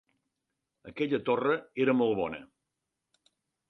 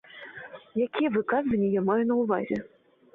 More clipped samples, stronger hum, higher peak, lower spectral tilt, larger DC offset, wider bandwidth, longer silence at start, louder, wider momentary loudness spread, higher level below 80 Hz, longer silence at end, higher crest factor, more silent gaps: neither; neither; about the same, -14 dBFS vs -14 dBFS; about the same, -8 dB/octave vs -9 dB/octave; neither; first, 6 kHz vs 4.3 kHz; first, 0.85 s vs 0.15 s; about the same, -29 LUFS vs -27 LUFS; second, 12 LU vs 17 LU; second, -70 dBFS vs -62 dBFS; first, 1.25 s vs 0.45 s; about the same, 18 dB vs 14 dB; neither